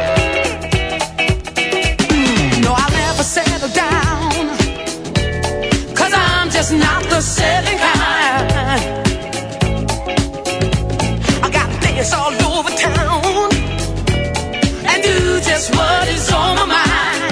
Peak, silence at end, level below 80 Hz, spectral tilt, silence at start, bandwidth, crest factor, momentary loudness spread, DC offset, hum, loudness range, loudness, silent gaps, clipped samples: 0 dBFS; 0 s; -26 dBFS; -4 dB/octave; 0 s; 11 kHz; 16 dB; 6 LU; under 0.1%; none; 3 LU; -15 LUFS; none; under 0.1%